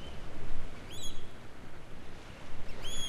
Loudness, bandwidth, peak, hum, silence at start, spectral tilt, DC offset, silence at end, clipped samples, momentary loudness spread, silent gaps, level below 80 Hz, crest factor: -47 LUFS; 11 kHz; -18 dBFS; none; 0 s; -3 dB/octave; under 0.1%; 0 s; under 0.1%; 7 LU; none; -40 dBFS; 12 dB